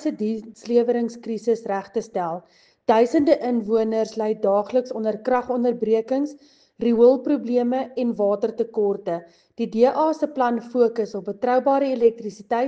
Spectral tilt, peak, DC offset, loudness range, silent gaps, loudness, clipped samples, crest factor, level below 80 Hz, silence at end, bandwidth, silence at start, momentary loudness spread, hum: -6.5 dB/octave; -4 dBFS; under 0.1%; 2 LU; none; -22 LUFS; under 0.1%; 18 dB; -66 dBFS; 0 s; 8 kHz; 0 s; 9 LU; none